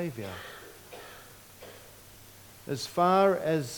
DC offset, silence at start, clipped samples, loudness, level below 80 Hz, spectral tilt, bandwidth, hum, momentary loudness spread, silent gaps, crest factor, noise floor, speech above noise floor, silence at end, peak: under 0.1%; 0 s; under 0.1%; -27 LUFS; -64 dBFS; -5.5 dB/octave; 19 kHz; none; 26 LU; none; 20 dB; -52 dBFS; 24 dB; 0 s; -10 dBFS